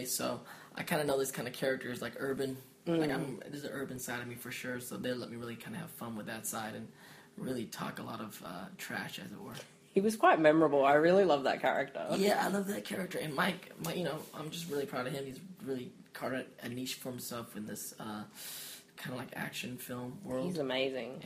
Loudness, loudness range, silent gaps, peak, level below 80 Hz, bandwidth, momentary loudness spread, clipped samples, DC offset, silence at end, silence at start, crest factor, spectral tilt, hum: -35 LUFS; 13 LU; none; -12 dBFS; -74 dBFS; 15.5 kHz; 17 LU; under 0.1%; under 0.1%; 0 s; 0 s; 22 dB; -4.5 dB/octave; none